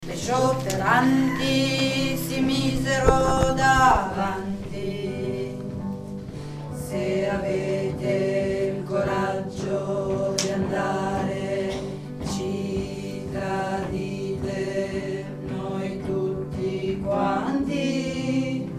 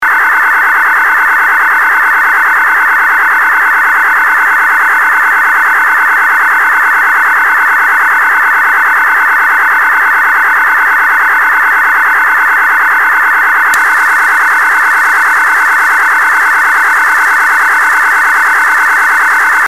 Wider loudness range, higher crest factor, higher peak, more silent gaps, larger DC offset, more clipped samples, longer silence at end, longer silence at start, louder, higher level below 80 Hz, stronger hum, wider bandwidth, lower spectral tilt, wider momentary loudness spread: first, 7 LU vs 0 LU; first, 22 dB vs 8 dB; about the same, -2 dBFS vs 0 dBFS; neither; second, under 0.1% vs 2%; neither; about the same, 0 s vs 0 s; about the same, 0 s vs 0 s; second, -25 LUFS vs -6 LUFS; first, -40 dBFS vs -56 dBFS; neither; about the same, 15.5 kHz vs 16 kHz; first, -5.5 dB/octave vs 1 dB/octave; first, 12 LU vs 0 LU